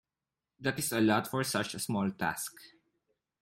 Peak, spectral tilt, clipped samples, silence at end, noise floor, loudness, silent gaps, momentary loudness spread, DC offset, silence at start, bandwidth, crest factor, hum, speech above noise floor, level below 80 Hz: -14 dBFS; -4 dB/octave; under 0.1%; 0.75 s; under -90 dBFS; -32 LUFS; none; 8 LU; under 0.1%; 0.6 s; 16.5 kHz; 20 dB; none; over 58 dB; -70 dBFS